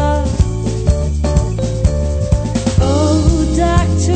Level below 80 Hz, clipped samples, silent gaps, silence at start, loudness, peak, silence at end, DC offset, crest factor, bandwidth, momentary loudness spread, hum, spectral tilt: -18 dBFS; under 0.1%; none; 0 s; -15 LUFS; 0 dBFS; 0 s; under 0.1%; 12 dB; 9.2 kHz; 4 LU; none; -6.5 dB/octave